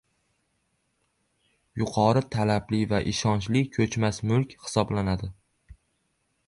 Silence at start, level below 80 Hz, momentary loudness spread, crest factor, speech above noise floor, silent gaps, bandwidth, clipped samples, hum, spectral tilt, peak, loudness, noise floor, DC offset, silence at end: 1.75 s; -48 dBFS; 7 LU; 20 dB; 49 dB; none; 11.5 kHz; under 0.1%; none; -6 dB/octave; -8 dBFS; -26 LUFS; -74 dBFS; under 0.1%; 0.75 s